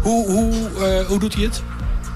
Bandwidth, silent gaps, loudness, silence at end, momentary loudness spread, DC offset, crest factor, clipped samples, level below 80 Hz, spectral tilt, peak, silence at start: 15 kHz; none; -20 LUFS; 0 s; 9 LU; under 0.1%; 10 dB; under 0.1%; -24 dBFS; -5.5 dB/octave; -8 dBFS; 0 s